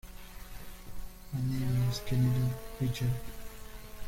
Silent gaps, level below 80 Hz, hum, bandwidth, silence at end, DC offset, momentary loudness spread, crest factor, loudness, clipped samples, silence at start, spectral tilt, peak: none; -46 dBFS; none; 16.5 kHz; 0 s; under 0.1%; 20 LU; 14 dB; -33 LUFS; under 0.1%; 0.05 s; -6.5 dB/octave; -18 dBFS